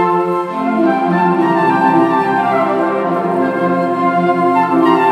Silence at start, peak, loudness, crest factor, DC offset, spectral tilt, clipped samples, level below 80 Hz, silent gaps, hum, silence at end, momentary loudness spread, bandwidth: 0 s; 0 dBFS; -14 LUFS; 14 dB; under 0.1%; -8 dB/octave; under 0.1%; -66 dBFS; none; none; 0 s; 4 LU; 9.6 kHz